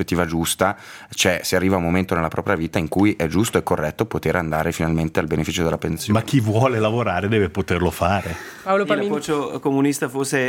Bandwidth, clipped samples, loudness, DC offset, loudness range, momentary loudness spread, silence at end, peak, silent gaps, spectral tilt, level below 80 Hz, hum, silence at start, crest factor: 17 kHz; under 0.1%; -21 LUFS; under 0.1%; 1 LU; 4 LU; 0 s; 0 dBFS; none; -5 dB/octave; -46 dBFS; none; 0 s; 20 dB